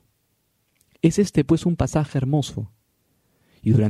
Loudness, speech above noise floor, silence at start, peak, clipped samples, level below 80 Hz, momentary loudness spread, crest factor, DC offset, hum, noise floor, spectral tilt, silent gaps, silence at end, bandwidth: -22 LUFS; 49 dB; 1.05 s; -4 dBFS; under 0.1%; -44 dBFS; 11 LU; 18 dB; under 0.1%; none; -69 dBFS; -7 dB/octave; none; 0 s; 13 kHz